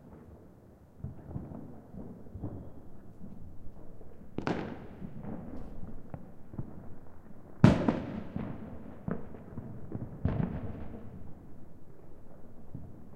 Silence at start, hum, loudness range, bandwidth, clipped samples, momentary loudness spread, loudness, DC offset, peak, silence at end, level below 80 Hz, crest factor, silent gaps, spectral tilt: 0 s; none; 14 LU; 9.8 kHz; under 0.1%; 21 LU; -36 LUFS; under 0.1%; -4 dBFS; 0 s; -50 dBFS; 32 dB; none; -8.5 dB/octave